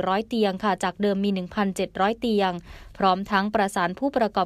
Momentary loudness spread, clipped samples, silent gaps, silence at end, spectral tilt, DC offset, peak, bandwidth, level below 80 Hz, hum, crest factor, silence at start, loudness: 3 LU; under 0.1%; none; 0 s; -5.5 dB/octave; under 0.1%; -6 dBFS; 14.5 kHz; -52 dBFS; none; 18 dB; 0 s; -24 LUFS